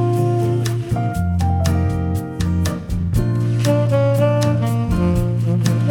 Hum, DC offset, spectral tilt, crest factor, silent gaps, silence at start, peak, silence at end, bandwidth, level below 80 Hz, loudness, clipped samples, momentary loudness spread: none; under 0.1%; -7.5 dB/octave; 12 dB; none; 0 s; -4 dBFS; 0 s; 15.5 kHz; -30 dBFS; -18 LUFS; under 0.1%; 5 LU